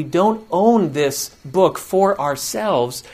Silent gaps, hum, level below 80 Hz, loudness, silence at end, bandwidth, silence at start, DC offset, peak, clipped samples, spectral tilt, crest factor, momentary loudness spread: none; none; -56 dBFS; -18 LUFS; 0 s; 15.5 kHz; 0 s; under 0.1%; 0 dBFS; under 0.1%; -5 dB/octave; 18 dB; 6 LU